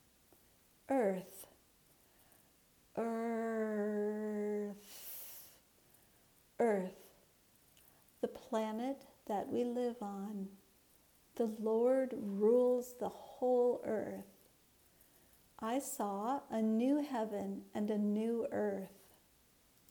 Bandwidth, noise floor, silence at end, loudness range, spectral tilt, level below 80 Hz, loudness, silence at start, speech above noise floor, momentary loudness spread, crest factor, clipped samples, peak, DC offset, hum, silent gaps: over 20 kHz; -69 dBFS; 1 s; 7 LU; -6 dB/octave; -78 dBFS; -38 LUFS; 0.9 s; 33 dB; 15 LU; 18 dB; under 0.1%; -22 dBFS; under 0.1%; none; none